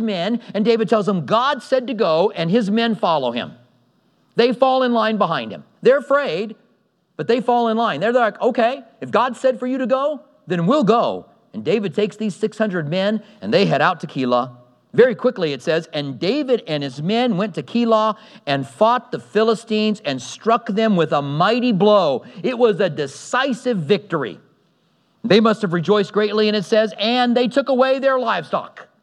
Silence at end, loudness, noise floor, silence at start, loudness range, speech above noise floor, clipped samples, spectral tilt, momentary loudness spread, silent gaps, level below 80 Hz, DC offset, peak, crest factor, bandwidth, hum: 0.2 s; -19 LUFS; -63 dBFS; 0 s; 2 LU; 44 dB; under 0.1%; -6 dB/octave; 9 LU; none; -78 dBFS; under 0.1%; 0 dBFS; 18 dB; 10.5 kHz; none